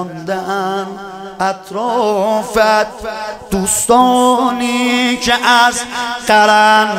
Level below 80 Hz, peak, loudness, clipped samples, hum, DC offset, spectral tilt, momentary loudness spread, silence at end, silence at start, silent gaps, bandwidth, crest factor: -44 dBFS; 0 dBFS; -13 LUFS; under 0.1%; none; under 0.1%; -2.5 dB/octave; 12 LU; 0 s; 0 s; none; 16.5 kHz; 14 dB